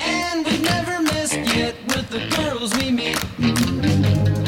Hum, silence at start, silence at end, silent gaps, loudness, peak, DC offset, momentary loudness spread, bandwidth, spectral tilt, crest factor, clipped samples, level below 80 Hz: none; 0 s; 0 s; none; -20 LUFS; -6 dBFS; under 0.1%; 4 LU; 17 kHz; -4.5 dB/octave; 14 dB; under 0.1%; -40 dBFS